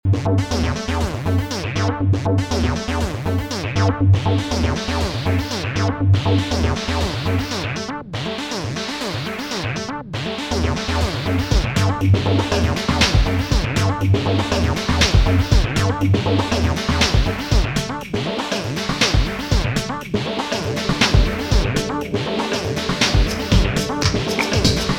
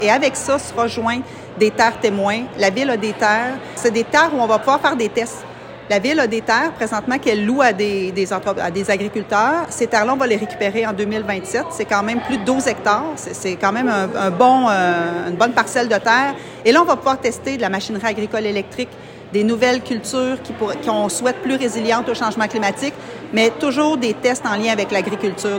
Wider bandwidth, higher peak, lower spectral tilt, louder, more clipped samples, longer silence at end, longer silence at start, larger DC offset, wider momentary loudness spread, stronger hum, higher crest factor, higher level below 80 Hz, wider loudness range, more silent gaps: about the same, 16.5 kHz vs 16.5 kHz; about the same, -2 dBFS vs 0 dBFS; about the same, -5 dB/octave vs -4 dB/octave; about the same, -20 LUFS vs -18 LUFS; neither; about the same, 0 s vs 0 s; about the same, 0.05 s vs 0 s; neither; about the same, 7 LU vs 7 LU; neither; about the same, 18 dB vs 18 dB; first, -26 dBFS vs -56 dBFS; about the same, 5 LU vs 4 LU; neither